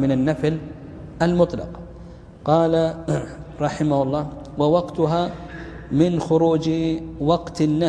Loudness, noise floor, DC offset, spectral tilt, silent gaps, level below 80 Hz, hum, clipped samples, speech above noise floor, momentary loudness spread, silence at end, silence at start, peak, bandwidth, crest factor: -21 LUFS; -40 dBFS; under 0.1%; -7.5 dB/octave; none; -44 dBFS; none; under 0.1%; 20 dB; 17 LU; 0 s; 0 s; -4 dBFS; 10.5 kHz; 18 dB